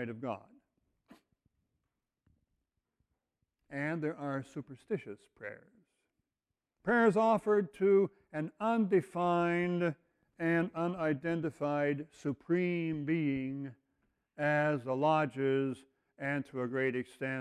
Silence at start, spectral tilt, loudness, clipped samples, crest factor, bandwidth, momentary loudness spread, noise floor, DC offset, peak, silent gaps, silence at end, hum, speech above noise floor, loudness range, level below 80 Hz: 0 s; -8 dB/octave; -33 LUFS; under 0.1%; 18 dB; 11.5 kHz; 14 LU; under -90 dBFS; under 0.1%; -16 dBFS; none; 0 s; none; over 57 dB; 12 LU; -74 dBFS